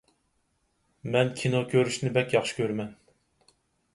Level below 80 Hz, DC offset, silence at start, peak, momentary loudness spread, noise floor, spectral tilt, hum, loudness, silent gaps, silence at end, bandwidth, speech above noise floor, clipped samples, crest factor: -66 dBFS; under 0.1%; 1.05 s; -8 dBFS; 9 LU; -73 dBFS; -5.5 dB/octave; none; -27 LUFS; none; 1 s; 11.5 kHz; 47 dB; under 0.1%; 22 dB